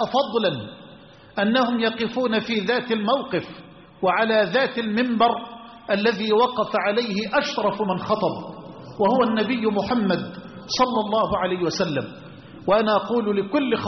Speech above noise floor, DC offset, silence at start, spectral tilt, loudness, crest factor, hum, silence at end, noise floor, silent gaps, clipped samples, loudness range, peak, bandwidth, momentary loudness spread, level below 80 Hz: 25 dB; under 0.1%; 0 s; -3.5 dB/octave; -22 LUFS; 16 dB; none; 0 s; -46 dBFS; none; under 0.1%; 2 LU; -6 dBFS; 6.4 kHz; 15 LU; -58 dBFS